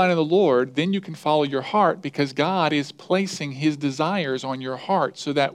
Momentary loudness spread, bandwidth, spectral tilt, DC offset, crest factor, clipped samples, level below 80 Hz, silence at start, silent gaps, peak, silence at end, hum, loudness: 7 LU; 12.5 kHz; -5.5 dB/octave; under 0.1%; 16 dB; under 0.1%; -74 dBFS; 0 s; none; -6 dBFS; 0 s; none; -23 LUFS